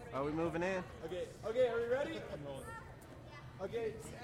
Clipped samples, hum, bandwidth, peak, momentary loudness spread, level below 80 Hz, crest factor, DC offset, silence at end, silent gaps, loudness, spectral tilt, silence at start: under 0.1%; none; 16 kHz; -22 dBFS; 18 LU; -62 dBFS; 18 dB; under 0.1%; 0 s; none; -40 LUFS; -6 dB/octave; 0 s